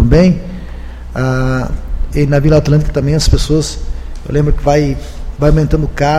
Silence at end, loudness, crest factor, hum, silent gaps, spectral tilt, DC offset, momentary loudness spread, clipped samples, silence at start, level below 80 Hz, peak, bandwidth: 0 s; -13 LUFS; 12 dB; none; none; -6.5 dB/octave; under 0.1%; 17 LU; 0.1%; 0 s; -18 dBFS; 0 dBFS; 13 kHz